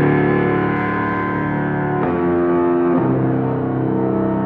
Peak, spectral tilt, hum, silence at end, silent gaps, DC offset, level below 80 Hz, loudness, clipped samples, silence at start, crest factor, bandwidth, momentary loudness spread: -4 dBFS; -11 dB/octave; none; 0 s; none; under 0.1%; -44 dBFS; -18 LUFS; under 0.1%; 0 s; 14 dB; 4.5 kHz; 4 LU